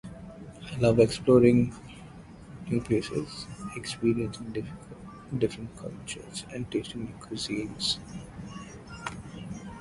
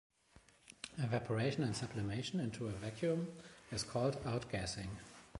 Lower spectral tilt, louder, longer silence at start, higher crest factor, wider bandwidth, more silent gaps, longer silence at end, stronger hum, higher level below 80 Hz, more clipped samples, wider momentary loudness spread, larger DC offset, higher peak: about the same, -6 dB/octave vs -5.5 dB/octave; first, -28 LUFS vs -40 LUFS; second, 0.05 s vs 0.35 s; about the same, 22 dB vs 18 dB; about the same, 11.5 kHz vs 11.5 kHz; neither; about the same, 0 s vs 0 s; neither; first, -52 dBFS vs -62 dBFS; neither; first, 22 LU vs 12 LU; neither; first, -8 dBFS vs -22 dBFS